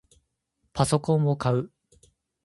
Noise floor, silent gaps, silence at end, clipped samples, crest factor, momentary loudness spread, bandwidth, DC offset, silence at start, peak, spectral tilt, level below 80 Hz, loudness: -75 dBFS; none; 0.75 s; under 0.1%; 22 dB; 14 LU; 11.5 kHz; under 0.1%; 0.75 s; -6 dBFS; -6.5 dB/octave; -54 dBFS; -25 LUFS